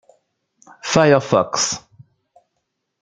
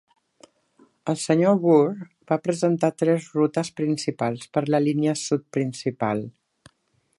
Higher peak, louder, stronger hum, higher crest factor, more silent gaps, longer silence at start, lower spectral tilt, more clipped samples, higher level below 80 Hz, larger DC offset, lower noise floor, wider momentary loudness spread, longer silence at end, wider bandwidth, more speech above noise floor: first, 0 dBFS vs -6 dBFS; first, -17 LUFS vs -23 LUFS; neither; about the same, 20 dB vs 18 dB; neither; second, 0.85 s vs 1.05 s; second, -4 dB/octave vs -6 dB/octave; neither; first, -58 dBFS vs -68 dBFS; neither; first, -75 dBFS vs -68 dBFS; first, 14 LU vs 9 LU; first, 1.25 s vs 0.9 s; second, 9.6 kHz vs 11.5 kHz; first, 58 dB vs 46 dB